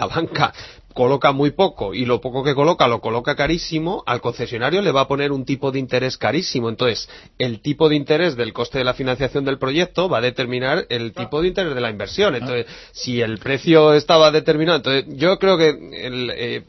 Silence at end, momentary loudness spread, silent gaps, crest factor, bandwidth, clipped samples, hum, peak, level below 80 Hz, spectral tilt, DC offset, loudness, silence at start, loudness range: 0.05 s; 10 LU; none; 18 dB; 6.2 kHz; under 0.1%; none; 0 dBFS; -46 dBFS; -5.5 dB/octave; under 0.1%; -19 LUFS; 0 s; 5 LU